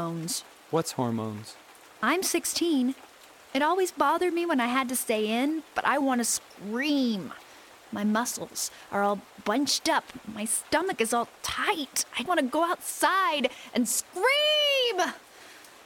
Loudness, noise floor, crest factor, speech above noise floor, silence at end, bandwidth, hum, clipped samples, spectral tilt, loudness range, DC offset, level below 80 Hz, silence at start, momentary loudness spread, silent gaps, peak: -27 LUFS; -50 dBFS; 18 dB; 23 dB; 0.05 s; 17 kHz; none; under 0.1%; -2.5 dB/octave; 4 LU; under 0.1%; -68 dBFS; 0 s; 9 LU; none; -10 dBFS